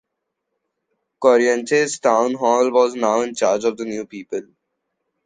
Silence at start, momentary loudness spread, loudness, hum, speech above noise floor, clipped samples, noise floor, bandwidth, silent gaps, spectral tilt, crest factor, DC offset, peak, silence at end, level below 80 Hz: 1.2 s; 13 LU; -18 LUFS; none; 60 dB; under 0.1%; -78 dBFS; 10 kHz; none; -3.5 dB/octave; 18 dB; under 0.1%; -2 dBFS; 0.85 s; -70 dBFS